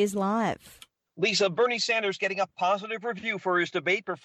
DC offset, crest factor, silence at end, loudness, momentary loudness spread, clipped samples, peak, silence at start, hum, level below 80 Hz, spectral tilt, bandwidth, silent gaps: under 0.1%; 14 dB; 0.1 s; -27 LUFS; 7 LU; under 0.1%; -14 dBFS; 0 s; none; -70 dBFS; -3.5 dB/octave; 14 kHz; none